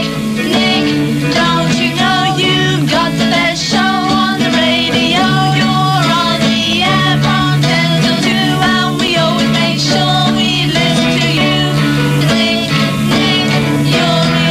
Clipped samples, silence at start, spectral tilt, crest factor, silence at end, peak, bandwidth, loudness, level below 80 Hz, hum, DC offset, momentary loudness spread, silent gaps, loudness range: under 0.1%; 0 s; -4.5 dB/octave; 12 dB; 0 s; 0 dBFS; 16 kHz; -11 LUFS; -38 dBFS; none; under 0.1%; 2 LU; none; 1 LU